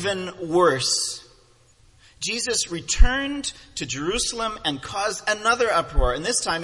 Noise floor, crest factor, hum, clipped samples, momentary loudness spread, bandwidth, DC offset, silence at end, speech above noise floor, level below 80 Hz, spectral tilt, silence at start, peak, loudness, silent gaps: -56 dBFS; 22 dB; none; under 0.1%; 10 LU; 11.5 kHz; under 0.1%; 0 s; 34 dB; -28 dBFS; -2.5 dB/octave; 0 s; 0 dBFS; -23 LUFS; none